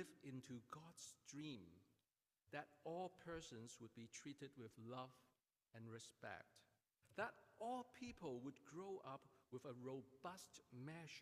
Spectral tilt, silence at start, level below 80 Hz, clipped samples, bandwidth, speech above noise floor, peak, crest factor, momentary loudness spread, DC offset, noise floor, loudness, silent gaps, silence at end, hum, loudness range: -4.5 dB/octave; 0 s; -84 dBFS; under 0.1%; 15.5 kHz; over 34 dB; -32 dBFS; 24 dB; 9 LU; under 0.1%; under -90 dBFS; -56 LUFS; none; 0 s; none; 4 LU